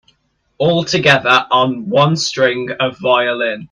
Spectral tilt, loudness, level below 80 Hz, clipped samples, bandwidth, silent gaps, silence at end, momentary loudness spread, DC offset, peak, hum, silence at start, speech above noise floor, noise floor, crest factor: -4.5 dB/octave; -14 LUFS; -56 dBFS; under 0.1%; 11 kHz; none; 0.05 s; 7 LU; under 0.1%; 0 dBFS; none; 0.6 s; 47 dB; -61 dBFS; 14 dB